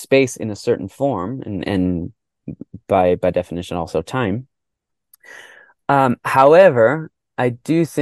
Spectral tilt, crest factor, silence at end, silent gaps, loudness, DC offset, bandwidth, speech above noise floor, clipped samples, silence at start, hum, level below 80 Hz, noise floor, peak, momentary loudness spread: -6.5 dB/octave; 18 dB; 0 s; none; -17 LUFS; under 0.1%; 12.5 kHz; 63 dB; under 0.1%; 0 s; none; -50 dBFS; -80 dBFS; 0 dBFS; 19 LU